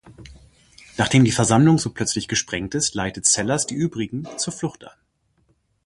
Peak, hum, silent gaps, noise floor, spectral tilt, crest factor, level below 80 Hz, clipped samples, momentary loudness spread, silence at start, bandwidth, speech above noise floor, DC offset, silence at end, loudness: -2 dBFS; none; none; -65 dBFS; -4 dB/octave; 20 dB; -50 dBFS; under 0.1%; 12 LU; 0.05 s; 11.5 kHz; 44 dB; under 0.1%; 0.95 s; -20 LUFS